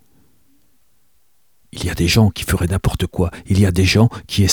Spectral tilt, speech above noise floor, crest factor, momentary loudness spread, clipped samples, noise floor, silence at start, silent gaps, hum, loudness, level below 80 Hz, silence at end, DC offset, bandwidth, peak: -5 dB/octave; 48 dB; 16 dB; 9 LU; under 0.1%; -64 dBFS; 1.75 s; none; none; -17 LUFS; -32 dBFS; 0 s; 0.2%; 19.5 kHz; -2 dBFS